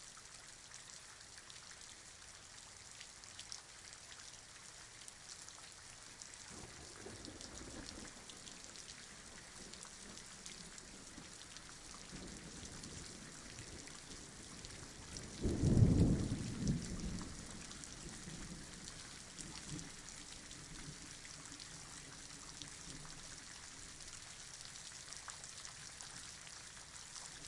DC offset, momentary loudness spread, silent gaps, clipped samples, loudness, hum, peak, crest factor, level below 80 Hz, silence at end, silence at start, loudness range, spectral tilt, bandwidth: under 0.1%; 11 LU; none; under 0.1%; -46 LUFS; none; -18 dBFS; 28 dB; -54 dBFS; 0 s; 0 s; 14 LU; -4.5 dB/octave; 11.5 kHz